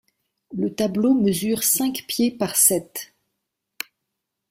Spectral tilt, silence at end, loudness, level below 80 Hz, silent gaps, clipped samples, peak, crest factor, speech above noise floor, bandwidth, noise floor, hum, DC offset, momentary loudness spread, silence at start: -3.5 dB/octave; 1.45 s; -20 LUFS; -62 dBFS; none; under 0.1%; -2 dBFS; 20 dB; 59 dB; 16.5 kHz; -80 dBFS; none; under 0.1%; 19 LU; 0.5 s